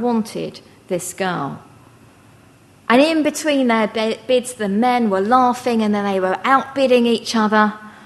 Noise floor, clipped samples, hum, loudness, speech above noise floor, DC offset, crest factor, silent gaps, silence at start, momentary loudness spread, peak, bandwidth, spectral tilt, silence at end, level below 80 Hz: -48 dBFS; under 0.1%; none; -17 LUFS; 31 dB; under 0.1%; 18 dB; none; 0 s; 11 LU; 0 dBFS; 12.5 kHz; -4.5 dB/octave; 0.15 s; -62 dBFS